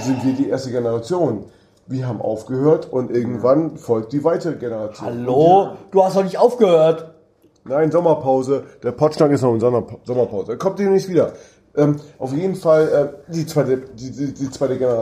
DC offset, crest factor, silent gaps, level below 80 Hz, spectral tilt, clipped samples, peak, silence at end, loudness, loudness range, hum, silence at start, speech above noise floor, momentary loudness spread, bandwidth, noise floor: under 0.1%; 16 dB; none; -58 dBFS; -7.5 dB/octave; under 0.1%; -2 dBFS; 0 s; -18 LUFS; 4 LU; none; 0 s; 36 dB; 11 LU; 14.5 kHz; -54 dBFS